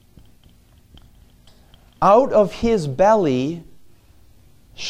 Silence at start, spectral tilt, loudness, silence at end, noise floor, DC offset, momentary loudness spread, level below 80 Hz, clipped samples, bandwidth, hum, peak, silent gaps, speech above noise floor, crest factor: 2 s; -6.5 dB/octave; -17 LUFS; 0 s; -52 dBFS; under 0.1%; 10 LU; -46 dBFS; under 0.1%; 11 kHz; none; -2 dBFS; none; 36 dB; 18 dB